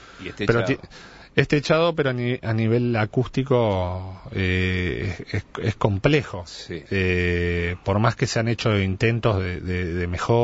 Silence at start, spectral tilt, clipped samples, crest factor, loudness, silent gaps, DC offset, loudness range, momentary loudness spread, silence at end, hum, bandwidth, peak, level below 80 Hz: 0 s; -6.5 dB/octave; under 0.1%; 20 dB; -23 LUFS; none; under 0.1%; 2 LU; 10 LU; 0 s; none; 8 kHz; -2 dBFS; -42 dBFS